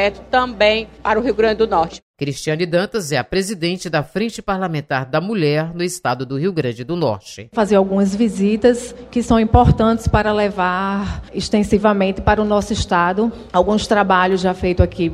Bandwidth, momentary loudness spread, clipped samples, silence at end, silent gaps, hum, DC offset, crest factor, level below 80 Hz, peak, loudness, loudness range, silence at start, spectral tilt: 14.5 kHz; 8 LU; under 0.1%; 0 s; 2.03-2.14 s; none; under 0.1%; 16 dB; -32 dBFS; 0 dBFS; -17 LUFS; 4 LU; 0 s; -6 dB/octave